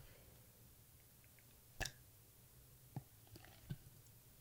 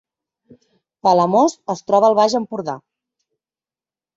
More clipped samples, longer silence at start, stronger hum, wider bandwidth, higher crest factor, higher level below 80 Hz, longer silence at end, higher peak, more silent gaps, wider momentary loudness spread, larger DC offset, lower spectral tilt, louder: neither; second, 0 s vs 1.05 s; neither; first, 16 kHz vs 8 kHz; first, 30 dB vs 18 dB; about the same, -66 dBFS vs -64 dBFS; second, 0 s vs 1.4 s; second, -26 dBFS vs -2 dBFS; neither; first, 16 LU vs 13 LU; neither; second, -3.5 dB/octave vs -5.5 dB/octave; second, -57 LUFS vs -17 LUFS